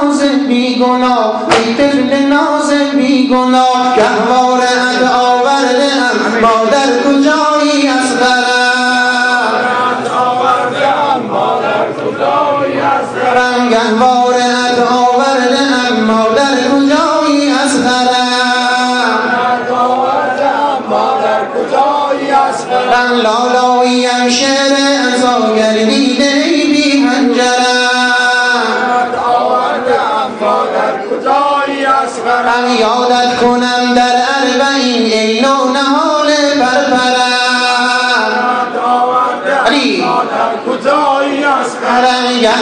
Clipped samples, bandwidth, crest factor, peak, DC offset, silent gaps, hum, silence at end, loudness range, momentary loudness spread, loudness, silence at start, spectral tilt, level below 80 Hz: under 0.1%; 10.5 kHz; 10 dB; 0 dBFS; under 0.1%; none; none; 0 s; 2 LU; 3 LU; -10 LUFS; 0 s; -3 dB/octave; -54 dBFS